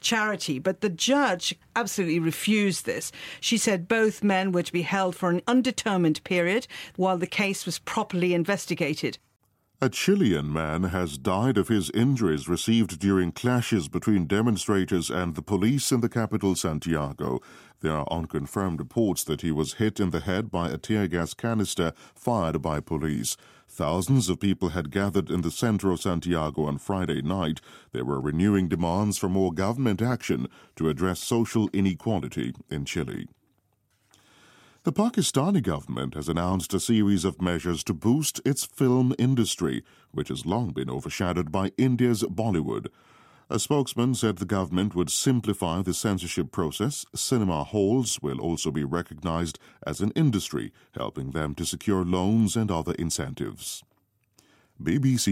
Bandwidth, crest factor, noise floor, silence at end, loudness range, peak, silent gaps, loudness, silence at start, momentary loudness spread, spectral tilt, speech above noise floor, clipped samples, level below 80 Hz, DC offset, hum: 16.5 kHz; 18 dB; -70 dBFS; 0 s; 4 LU; -8 dBFS; none; -26 LUFS; 0.05 s; 8 LU; -5 dB/octave; 44 dB; under 0.1%; -50 dBFS; under 0.1%; none